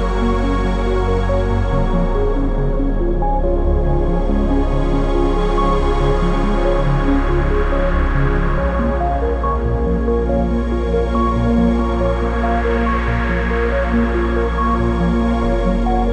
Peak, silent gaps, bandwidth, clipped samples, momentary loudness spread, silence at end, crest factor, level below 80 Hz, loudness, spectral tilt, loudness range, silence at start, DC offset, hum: -2 dBFS; none; 8.2 kHz; under 0.1%; 2 LU; 0 s; 12 dB; -18 dBFS; -18 LUFS; -8 dB/octave; 1 LU; 0 s; under 0.1%; none